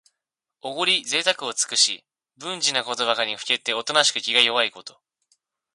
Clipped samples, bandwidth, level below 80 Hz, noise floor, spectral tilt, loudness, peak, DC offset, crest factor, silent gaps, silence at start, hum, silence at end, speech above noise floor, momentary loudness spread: under 0.1%; 11.5 kHz; -76 dBFS; -85 dBFS; 0.5 dB/octave; -21 LUFS; -2 dBFS; under 0.1%; 22 dB; none; 0.65 s; none; 0.85 s; 61 dB; 15 LU